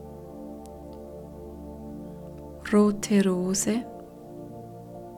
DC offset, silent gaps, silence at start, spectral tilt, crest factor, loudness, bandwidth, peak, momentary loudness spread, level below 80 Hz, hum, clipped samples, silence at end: under 0.1%; none; 0 s; -5.5 dB/octave; 20 dB; -24 LUFS; 15.5 kHz; -10 dBFS; 20 LU; -52 dBFS; none; under 0.1%; 0 s